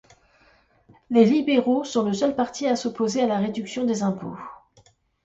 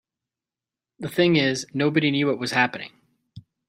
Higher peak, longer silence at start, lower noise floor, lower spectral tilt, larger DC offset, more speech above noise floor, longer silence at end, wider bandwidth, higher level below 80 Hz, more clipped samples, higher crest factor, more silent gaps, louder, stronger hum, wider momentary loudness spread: about the same, -6 dBFS vs -4 dBFS; about the same, 1.1 s vs 1 s; second, -59 dBFS vs -90 dBFS; about the same, -5.5 dB/octave vs -5 dB/octave; neither; second, 37 dB vs 68 dB; first, 0.7 s vs 0.3 s; second, 8 kHz vs 15.5 kHz; about the same, -64 dBFS vs -66 dBFS; neither; about the same, 18 dB vs 20 dB; neither; about the same, -23 LUFS vs -22 LUFS; neither; second, 12 LU vs 16 LU